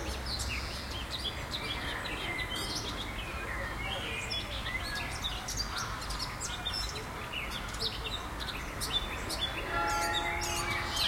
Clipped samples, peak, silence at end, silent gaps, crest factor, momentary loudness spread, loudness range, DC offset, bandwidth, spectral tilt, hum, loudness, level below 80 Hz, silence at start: under 0.1%; -18 dBFS; 0 s; none; 16 dB; 6 LU; 2 LU; under 0.1%; 16.5 kHz; -2.5 dB/octave; none; -35 LUFS; -44 dBFS; 0 s